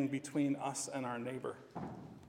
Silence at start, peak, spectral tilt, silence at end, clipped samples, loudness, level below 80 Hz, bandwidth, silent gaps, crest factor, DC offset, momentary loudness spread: 0 s; -24 dBFS; -5 dB/octave; 0 s; under 0.1%; -40 LUFS; -78 dBFS; 16 kHz; none; 16 dB; under 0.1%; 11 LU